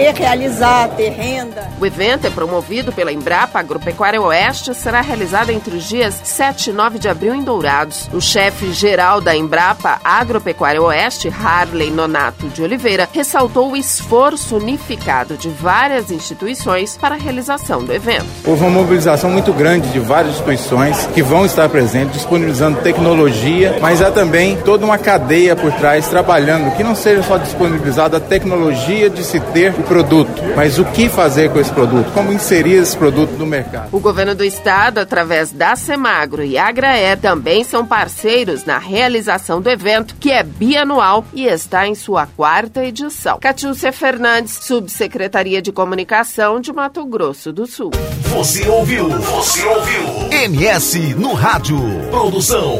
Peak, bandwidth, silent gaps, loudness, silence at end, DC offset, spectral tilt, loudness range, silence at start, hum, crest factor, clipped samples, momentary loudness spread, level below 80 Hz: 0 dBFS; 16 kHz; none; -13 LUFS; 0 s; under 0.1%; -4.5 dB/octave; 4 LU; 0 s; none; 14 dB; under 0.1%; 7 LU; -36 dBFS